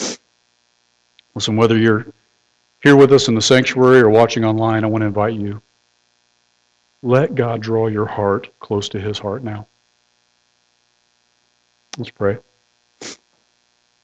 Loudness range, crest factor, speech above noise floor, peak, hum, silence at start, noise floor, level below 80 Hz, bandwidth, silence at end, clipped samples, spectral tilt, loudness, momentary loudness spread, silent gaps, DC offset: 17 LU; 16 dB; 48 dB; -2 dBFS; 60 Hz at -45 dBFS; 0 s; -63 dBFS; -52 dBFS; 10 kHz; 0.9 s; under 0.1%; -5.5 dB/octave; -15 LUFS; 23 LU; none; under 0.1%